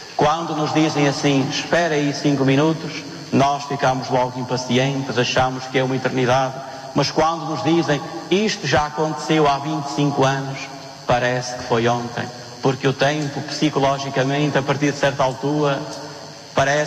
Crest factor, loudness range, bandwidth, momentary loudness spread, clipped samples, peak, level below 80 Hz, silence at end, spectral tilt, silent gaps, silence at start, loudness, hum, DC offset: 14 dB; 2 LU; 14 kHz; 8 LU; under 0.1%; -6 dBFS; -50 dBFS; 0 s; -5 dB/octave; none; 0 s; -20 LUFS; none; under 0.1%